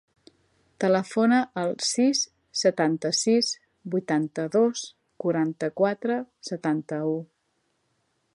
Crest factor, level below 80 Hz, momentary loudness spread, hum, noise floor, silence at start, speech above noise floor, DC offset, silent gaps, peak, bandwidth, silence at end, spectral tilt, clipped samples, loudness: 18 dB; -76 dBFS; 9 LU; none; -73 dBFS; 0.8 s; 49 dB; under 0.1%; none; -8 dBFS; 11.5 kHz; 1.1 s; -4 dB/octave; under 0.1%; -25 LUFS